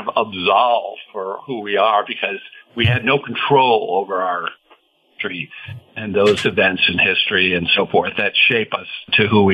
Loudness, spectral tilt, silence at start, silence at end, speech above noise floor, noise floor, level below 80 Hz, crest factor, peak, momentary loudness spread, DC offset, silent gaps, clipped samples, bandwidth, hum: -16 LUFS; -5.5 dB/octave; 0 s; 0 s; 37 dB; -54 dBFS; -54 dBFS; 16 dB; -2 dBFS; 14 LU; under 0.1%; none; under 0.1%; 10.5 kHz; none